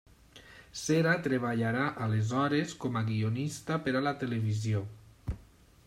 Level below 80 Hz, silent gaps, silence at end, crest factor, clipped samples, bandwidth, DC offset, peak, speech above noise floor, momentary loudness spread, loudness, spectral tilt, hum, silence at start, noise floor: -56 dBFS; none; 0.45 s; 18 dB; under 0.1%; 13.5 kHz; under 0.1%; -14 dBFS; 27 dB; 14 LU; -31 LUFS; -6 dB/octave; none; 0.35 s; -57 dBFS